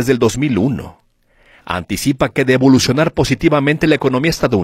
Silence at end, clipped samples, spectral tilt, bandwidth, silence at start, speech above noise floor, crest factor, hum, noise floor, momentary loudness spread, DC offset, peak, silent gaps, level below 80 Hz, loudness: 0 s; under 0.1%; -5.5 dB/octave; 15.5 kHz; 0 s; 38 dB; 14 dB; none; -52 dBFS; 9 LU; under 0.1%; 0 dBFS; none; -38 dBFS; -14 LUFS